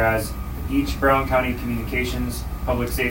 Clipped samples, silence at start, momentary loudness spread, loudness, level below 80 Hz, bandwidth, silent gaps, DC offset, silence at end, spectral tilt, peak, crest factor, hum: under 0.1%; 0 s; 9 LU; -23 LUFS; -30 dBFS; 16.5 kHz; none; under 0.1%; 0 s; -5.5 dB/octave; -6 dBFS; 18 dB; none